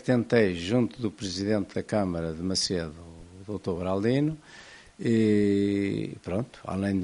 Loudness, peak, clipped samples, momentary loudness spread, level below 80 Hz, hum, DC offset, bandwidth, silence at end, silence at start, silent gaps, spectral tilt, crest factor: -27 LUFS; -8 dBFS; under 0.1%; 16 LU; -54 dBFS; none; under 0.1%; 11 kHz; 0 s; 0.05 s; none; -6 dB/octave; 20 dB